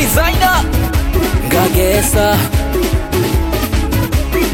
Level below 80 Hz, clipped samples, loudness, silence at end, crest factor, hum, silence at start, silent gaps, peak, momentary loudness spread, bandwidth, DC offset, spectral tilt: -18 dBFS; under 0.1%; -14 LUFS; 0 s; 12 dB; none; 0 s; none; 0 dBFS; 4 LU; 17.5 kHz; under 0.1%; -5 dB/octave